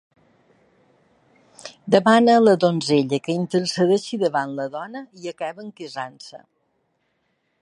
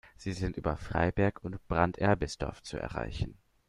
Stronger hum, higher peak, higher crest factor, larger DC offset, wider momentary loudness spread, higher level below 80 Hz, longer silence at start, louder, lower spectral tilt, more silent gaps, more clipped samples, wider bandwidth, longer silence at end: neither; first, -2 dBFS vs -10 dBFS; about the same, 22 dB vs 22 dB; neither; first, 21 LU vs 11 LU; second, -70 dBFS vs -46 dBFS; first, 1.65 s vs 0.05 s; first, -20 LUFS vs -33 LUFS; about the same, -5.5 dB/octave vs -6.5 dB/octave; neither; neither; about the same, 11 kHz vs 11.5 kHz; first, 1.25 s vs 0.35 s